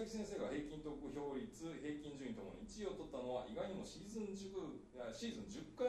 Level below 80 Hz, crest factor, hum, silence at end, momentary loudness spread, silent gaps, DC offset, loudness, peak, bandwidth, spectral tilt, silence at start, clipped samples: -66 dBFS; 18 dB; none; 0 s; 6 LU; none; under 0.1%; -48 LUFS; -30 dBFS; 13 kHz; -5 dB/octave; 0 s; under 0.1%